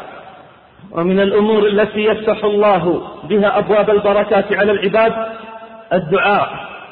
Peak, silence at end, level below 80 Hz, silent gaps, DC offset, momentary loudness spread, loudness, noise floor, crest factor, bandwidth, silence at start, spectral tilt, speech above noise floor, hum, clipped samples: -4 dBFS; 0 s; -50 dBFS; none; 0.1%; 13 LU; -15 LUFS; -42 dBFS; 12 dB; 4.5 kHz; 0 s; -10.5 dB/octave; 28 dB; none; under 0.1%